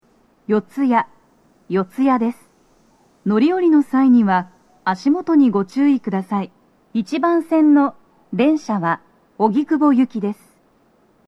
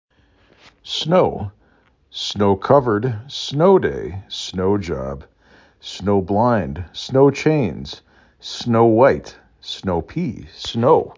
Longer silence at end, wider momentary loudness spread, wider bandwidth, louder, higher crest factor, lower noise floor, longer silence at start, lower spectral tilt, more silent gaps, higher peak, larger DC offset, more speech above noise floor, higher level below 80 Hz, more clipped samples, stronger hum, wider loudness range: first, 0.95 s vs 0.05 s; second, 12 LU vs 17 LU; first, 10 kHz vs 7.6 kHz; about the same, -18 LUFS vs -18 LUFS; about the same, 16 dB vs 18 dB; about the same, -57 dBFS vs -57 dBFS; second, 0.5 s vs 0.85 s; about the same, -7.5 dB/octave vs -6.5 dB/octave; neither; about the same, -2 dBFS vs -2 dBFS; neither; about the same, 41 dB vs 39 dB; second, -68 dBFS vs -42 dBFS; neither; neither; about the same, 3 LU vs 2 LU